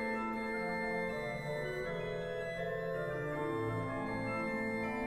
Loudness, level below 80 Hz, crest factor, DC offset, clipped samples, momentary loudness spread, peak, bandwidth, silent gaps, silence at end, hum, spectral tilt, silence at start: -38 LUFS; -58 dBFS; 12 dB; under 0.1%; under 0.1%; 3 LU; -26 dBFS; 15.5 kHz; none; 0 s; none; -6.5 dB/octave; 0 s